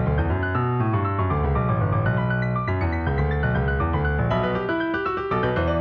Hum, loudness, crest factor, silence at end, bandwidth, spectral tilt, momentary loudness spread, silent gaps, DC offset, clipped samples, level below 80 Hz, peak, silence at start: none; -23 LUFS; 12 dB; 0 s; 5.4 kHz; -10 dB/octave; 2 LU; none; under 0.1%; under 0.1%; -32 dBFS; -10 dBFS; 0 s